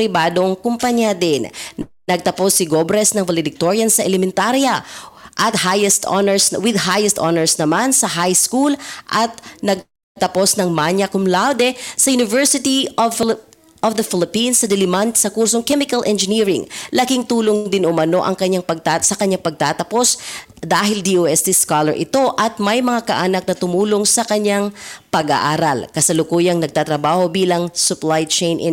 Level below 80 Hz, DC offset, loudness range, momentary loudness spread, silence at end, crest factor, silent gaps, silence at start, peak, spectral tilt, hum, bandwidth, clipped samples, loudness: -56 dBFS; under 0.1%; 2 LU; 7 LU; 0 s; 12 dB; 10.03-10.15 s; 0 s; -4 dBFS; -3 dB/octave; none; 17 kHz; under 0.1%; -16 LUFS